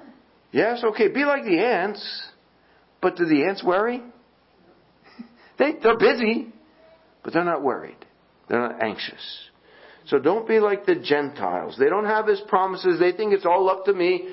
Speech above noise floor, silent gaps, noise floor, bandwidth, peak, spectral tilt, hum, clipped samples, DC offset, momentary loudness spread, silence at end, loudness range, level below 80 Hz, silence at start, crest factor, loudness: 37 dB; none; -58 dBFS; 5.8 kHz; -4 dBFS; -9.5 dB/octave; none; under 0.1%; under 0.1%; 12 LU; 0 s; 5 LU; -66 dBFS; 0.05 s; 20 dB; -22 LUFS